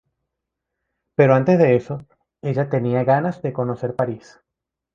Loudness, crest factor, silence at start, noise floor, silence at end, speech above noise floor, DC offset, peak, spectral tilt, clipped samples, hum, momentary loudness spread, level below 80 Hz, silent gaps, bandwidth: -19 LUFS; 20 dB; 1.2 s; -81 dBFS; 0.8 s; 63 dB; under 0.1%; 0 dBFS; -9.5 dB/octave; under 0.1%; none; 15 LU; -58 dBFS; none; 7.2 kHz